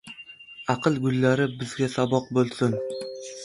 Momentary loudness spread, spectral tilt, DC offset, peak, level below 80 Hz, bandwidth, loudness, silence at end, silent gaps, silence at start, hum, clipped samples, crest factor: 14 LU; -6 dB/octave; under 0.1%; -6 dBFS; -62 dBFS; 11.5 kHz; -25 LUFS; 0 s; none; 0.05 s; none; under 0.1%; 20 dB